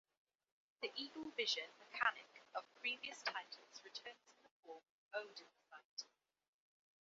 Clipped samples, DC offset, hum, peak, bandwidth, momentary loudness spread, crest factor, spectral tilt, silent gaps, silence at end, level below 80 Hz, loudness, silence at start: under 0.1%; under 0.1%; none; -22 dBFS; 7.4 kHz; 20 LU; 26 dB; 3 dB/octave; 4.51-4.63 s, 4.90-5.11 s, 5.85-5.97 s; 0.95 s; under -90 dBFS; -45 LUFS; 0.8 s